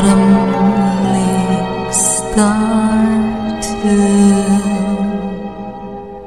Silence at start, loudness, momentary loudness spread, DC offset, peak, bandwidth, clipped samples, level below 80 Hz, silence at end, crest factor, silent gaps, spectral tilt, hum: 0 s; -13 LUFS; 13 LU; 0.6%; 0 dBFS; 13 kHz; under 0.1%; -34 dBFS; 0 s; 12 dB; none; -5.5 dB/octave; none